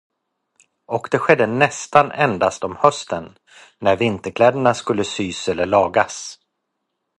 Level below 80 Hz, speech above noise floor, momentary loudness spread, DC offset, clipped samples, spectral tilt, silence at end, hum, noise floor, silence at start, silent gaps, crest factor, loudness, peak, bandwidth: -52 dBFS; 57 dB; 11 LU; under 0.1%; under 0.1%; -4.5 dB/octave; 0.85 s; none; -76 dBFS; 0.9 s; none; 20 dB; -18 LUFS; 0 dBFS; 11.5 kHz